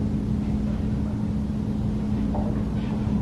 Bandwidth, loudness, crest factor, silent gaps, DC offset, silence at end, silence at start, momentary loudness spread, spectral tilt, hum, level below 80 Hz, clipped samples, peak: 9.2 kHz; -26 LUFS; 12 dB; none; under 0.1%; 0 s; 0 s; 1 LU; -9 dB/octave; none; -32 dBFS; under 0.1%; -12 dBFS